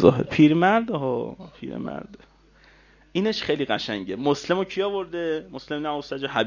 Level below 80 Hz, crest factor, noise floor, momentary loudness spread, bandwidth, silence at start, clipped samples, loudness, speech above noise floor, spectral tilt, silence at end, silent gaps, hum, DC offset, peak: -54 dBFS; 24 dB; -55 dBFS; 15 LU; 7.4 kHz; 0 s; under 0.1%; -24 LUFS; 31 dB; -6.5 dB/octave; 0 s; none; none; under 0.1%; 0 dBFS